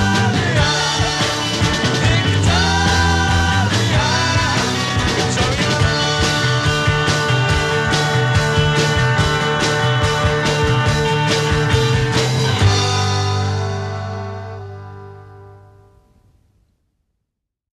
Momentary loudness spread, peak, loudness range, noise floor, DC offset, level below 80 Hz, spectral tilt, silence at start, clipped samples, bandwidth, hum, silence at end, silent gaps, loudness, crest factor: 6 LU; -2 dBFS; 7 LU; -77 dBFS; under 0.1%; -32 dBFS; -4.5 dB/octave; 0 s; under 0.1%; 13 kHz; none; 2.2 s; none; -16 LUFS; 16 dB